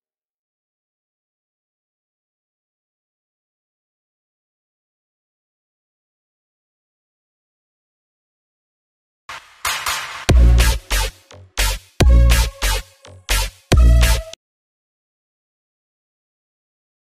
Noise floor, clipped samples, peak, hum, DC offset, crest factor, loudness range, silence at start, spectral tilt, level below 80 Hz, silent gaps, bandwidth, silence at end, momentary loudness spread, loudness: -39 dBFS; under 0.1%; 0 dBFS; none; under 0.1%; 20 dB; 9 LU; 9.3 s; -4 dB/octave; -22 dBFS; none; 15.5 kHz; 2.75 s; 16 LU; -17 LUFS